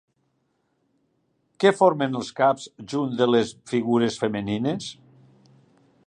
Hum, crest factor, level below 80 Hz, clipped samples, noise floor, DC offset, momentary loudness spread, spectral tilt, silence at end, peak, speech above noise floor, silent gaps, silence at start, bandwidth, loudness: none; 20 dB; -64 dBFS; under 0.1%; -71 dBFS; under 0.1%; 10 LU; -5.5 dB/octave; 1.15 s; -4 dBFS; 49 dB; none; 1.6 s; 10 kHz; -23 LUFS